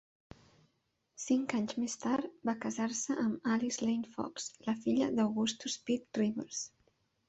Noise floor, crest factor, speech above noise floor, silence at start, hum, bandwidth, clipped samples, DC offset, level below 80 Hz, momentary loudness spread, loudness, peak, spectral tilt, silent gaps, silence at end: -79 dBFS; 20 dB; 45 dB; 1.2 s; none; 8.2 kHz; under 0.1%; under 0.1%; -72 dBFS; 8 LU; -35 LUFS; -16 dBFS; -4 dB/octave; none; 0.6 s